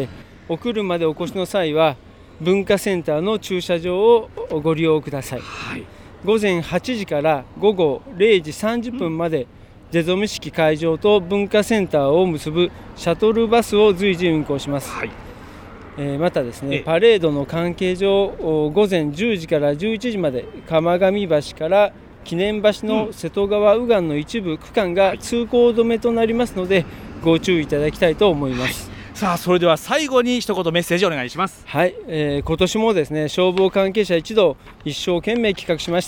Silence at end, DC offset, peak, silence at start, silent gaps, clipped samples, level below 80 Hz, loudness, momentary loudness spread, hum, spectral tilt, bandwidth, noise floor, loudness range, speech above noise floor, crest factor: 0 s; under 0.1%; -2 dBFS; 0 s; none; under 0.1%; -44 dBFS; -19 LUFS; 10 LU; none; -5.5 dB/octave; 19 kHz; -38 dBFS; 3 LU; 19 dB; 16 dB